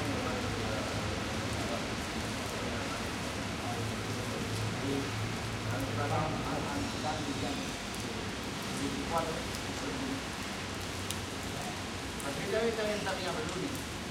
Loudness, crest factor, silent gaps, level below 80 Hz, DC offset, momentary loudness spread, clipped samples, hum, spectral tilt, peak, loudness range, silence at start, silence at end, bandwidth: -35 LUFS; 24 dB; none; -50 dBFS; under 0.1%; 4 LU; under 0.1%; none; -4 dB/octave; -12 dBFS; 2 LU; 0 s; 0 s; 16.5 kHz